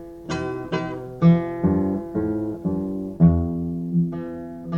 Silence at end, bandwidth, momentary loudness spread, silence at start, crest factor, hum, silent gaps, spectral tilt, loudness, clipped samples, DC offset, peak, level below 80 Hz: 0 s; 7 kHz; 12 LU; 0 s; 18 dB; none; none; -9 dB/octave; -23 LUFS; under 0.1%; under 0.1%; -4 dBFS; -40 dBFS